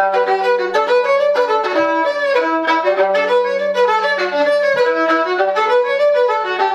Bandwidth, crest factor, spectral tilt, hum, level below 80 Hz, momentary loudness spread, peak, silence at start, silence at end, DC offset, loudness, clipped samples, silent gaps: 9.8 kHz; 12 dB; -3.5 dB/octave; none; -66 dBFS; 2 LU; -4 dBFS; 0 s; 0 s; under 0.1%; -15 LUFS; under 0.1%; none